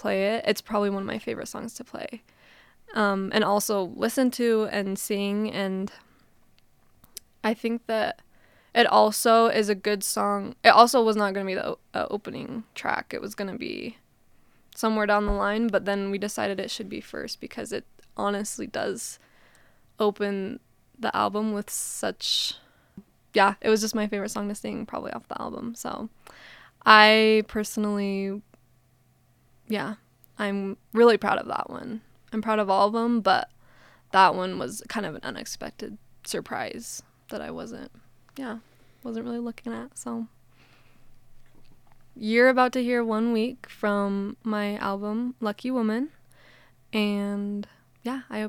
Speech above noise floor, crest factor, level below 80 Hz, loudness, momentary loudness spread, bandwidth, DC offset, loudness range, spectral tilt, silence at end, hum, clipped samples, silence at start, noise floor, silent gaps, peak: 37 dB; 26 dB; -54 dBFS; -25 LUFS; 18 LU; 18 kHz; under 0.1%; 13 LU; -4 dB/octave; 0 s; none; under 0.1%; 0 s; -63 dBFS; none; 0 dBFS